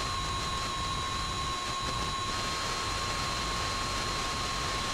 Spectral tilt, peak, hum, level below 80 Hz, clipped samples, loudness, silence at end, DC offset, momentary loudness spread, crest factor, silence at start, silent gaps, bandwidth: -2.5 dB/octave; -18 dBFS; none; -42 dBFS; under 0.1%; -31 LUFS; 0 s; under 0.1%; 1 LU; 14 dB; 0 s; none; 16 kHz